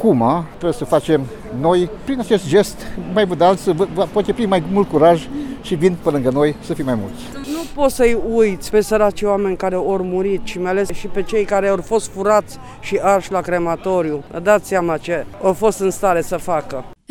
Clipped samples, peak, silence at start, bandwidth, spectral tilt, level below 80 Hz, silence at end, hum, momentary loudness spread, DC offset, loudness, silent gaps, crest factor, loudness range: under 0.1%; -2 dBFS; 0 s; 17.5 kHz; -6 dB/octave; -38 dBFS; 0.15 s; none; 9 LU; under 0.1%; -18 LUFS; none; 16 dB; 2 LU